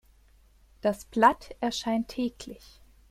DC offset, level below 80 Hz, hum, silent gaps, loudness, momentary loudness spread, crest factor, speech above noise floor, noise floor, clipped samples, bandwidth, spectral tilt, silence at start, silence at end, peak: under 0.1%; -56 dBFS; none; none; -28 LUFS; 21 LU; 22 dB; 32 dB; -59 dBFS; under 0.1%; 15.5 kHz; -4 dB/octave; 0.85 s; 0.55 s; -6 dBFS